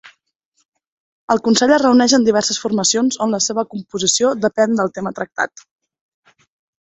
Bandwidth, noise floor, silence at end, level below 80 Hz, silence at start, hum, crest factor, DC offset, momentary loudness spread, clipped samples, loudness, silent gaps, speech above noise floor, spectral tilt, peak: 8.4 kHz; -67 dBFS; 1.35 s; -60 dBFS; 0.05 s; none; 16 dB; under 0.1%; 11 LU; under 0.1%; -16 LUFS; 0.36-0.40 s, 0.46-0.52 s, 0.65-0.72 s, 0.87-1.28 s; 51 dB; -3 dB/octave; -2 dBFS